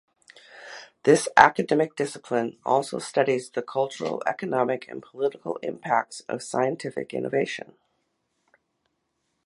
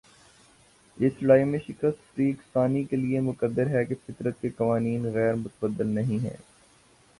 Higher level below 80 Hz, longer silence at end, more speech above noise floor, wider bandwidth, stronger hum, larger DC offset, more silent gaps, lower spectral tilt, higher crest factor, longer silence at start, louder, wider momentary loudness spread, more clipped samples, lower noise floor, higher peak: about the same, -64 dBFS vs -60 dBFS; first, 1.85 s vs 0.8 s; first, 51 dB vs 33 dB; about the same, 11.5 kHz vs 11.5 kHz; neither; neither; neither; second, -4.5 dB/octave vs -9 dB/octave; first, 26 dB vs 20 dB; second, 0.55 s vs 0.95 s; about the same, -25 LUFS vs -27 LUFS; first, 14 LU vs 10 LU; neither; first, -76 dBFS vs -59 dBFS; first, 0 dBFS vs -8 dBFS